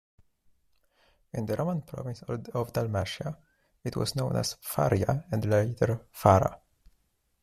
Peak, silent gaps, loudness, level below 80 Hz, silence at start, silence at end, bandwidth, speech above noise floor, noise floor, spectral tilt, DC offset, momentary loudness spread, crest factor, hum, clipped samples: -6 dBFS; none; -29 LUFS; -56 dBFS; 1.35 s; 0.85 s; 15.5 kHz; 43 dB; -71 dBFS; -6 dB/octave; under 0.1%; 14 LU; 24 dB; none; under 0.1%